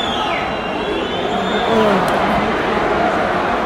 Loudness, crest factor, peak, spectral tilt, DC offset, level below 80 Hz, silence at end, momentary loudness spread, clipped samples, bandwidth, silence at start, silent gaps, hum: -17 LUFS; 14 dB; -2 dBFS; -5 dB/octave; under 0.1%; -38 dBFS; 0 s; 5 LU; under 0.1%; 16 kHz; 0 s; none; none